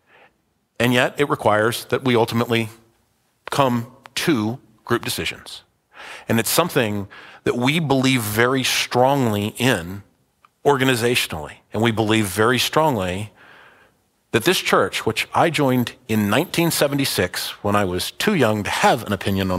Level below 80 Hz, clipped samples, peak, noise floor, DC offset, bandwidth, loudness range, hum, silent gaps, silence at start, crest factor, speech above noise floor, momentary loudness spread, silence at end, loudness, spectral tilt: -54 dBFS; under 0.1%; 0 dBFS; -66 dBFS; under 0.1%; 16 kHz; 4 LU; none; none; 0.8 s; 20 dB; 47 dB; 10 LU; 0 s; -20 LUFS; -4.5 dB/octave